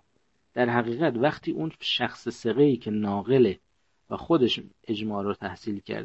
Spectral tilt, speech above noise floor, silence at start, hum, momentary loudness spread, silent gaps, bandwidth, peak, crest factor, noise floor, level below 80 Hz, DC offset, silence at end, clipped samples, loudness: -6.5 dB/octave; 46 dB; 0.55 s; none; 11 LU; none; 8.2 kHz; -6 dBFS; 20 dB; -71 dBFS; -62 dBFS; under 0.1%; 0 s; under 0.1%; -26 LUFS